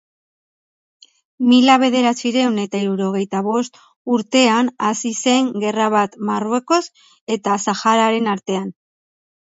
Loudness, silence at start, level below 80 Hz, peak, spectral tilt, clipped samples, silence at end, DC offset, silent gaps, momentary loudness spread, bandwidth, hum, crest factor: -17 LUFS; 1.4 s; -70 dBFS; 0 dBFS; -4 dB/octave; under 0.1%; 0.8 s; under 0.1%; 3.96-4.05 s, 7.21-7.27 s; 10 LU; 8 kHz; none; 18 dB